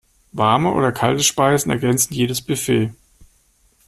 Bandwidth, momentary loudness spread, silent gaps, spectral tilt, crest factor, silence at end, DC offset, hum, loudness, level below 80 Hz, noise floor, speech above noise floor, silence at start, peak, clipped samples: 15.5 kHz; 6 LU; none; -4 dB/octave; 16 dB; 0.65 s; under 0.1%; none; -18 LUFS; -50 dBFS; -58 dBFS; 41 dB; 0.35 s; -2 dBFS; under 0.1%